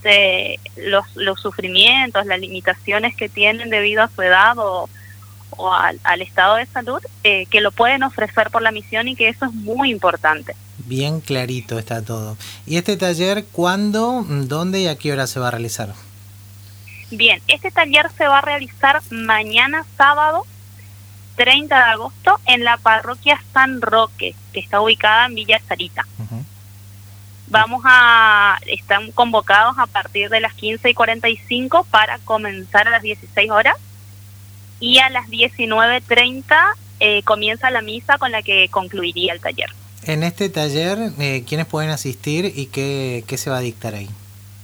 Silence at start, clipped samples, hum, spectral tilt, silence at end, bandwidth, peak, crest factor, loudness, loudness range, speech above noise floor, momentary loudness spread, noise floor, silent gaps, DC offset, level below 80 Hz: 0 s; under 0.1%; 50 Hz at -40 dBFS; -3.5 dB/octave; 0 s; over 20 kHz; 0 dBFS; 18 dB; -15 LUFS; 7 LU; 23 dB; 13 LU; -40 dBFS; none; under 0.1%; -56 dBFS